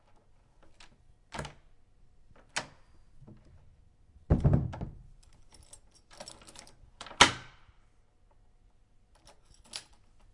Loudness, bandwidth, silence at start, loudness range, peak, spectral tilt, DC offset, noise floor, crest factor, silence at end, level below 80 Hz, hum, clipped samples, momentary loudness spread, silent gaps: -30 LUFS; 11.5 kHz; 1.35 s; 14 LU; -2 dBFS; -3.5 dB/octave; under 0.1%; -63 dBFS; 34 dB; 0.55 s; -46 dBFS; none; under 0.1%; 29 LU; none